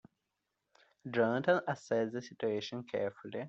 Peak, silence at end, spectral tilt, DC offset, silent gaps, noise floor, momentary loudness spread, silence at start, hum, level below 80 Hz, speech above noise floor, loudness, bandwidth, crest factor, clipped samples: -16 dBFS; 0 s; -4.5 dB/octave; under 0.1%; none; -86 dBFS; 8 LU; 1.05 s; none; -80 dBFS; 51 dB; -35 LUFS; 8 kHz; 20 dB; under 0.1%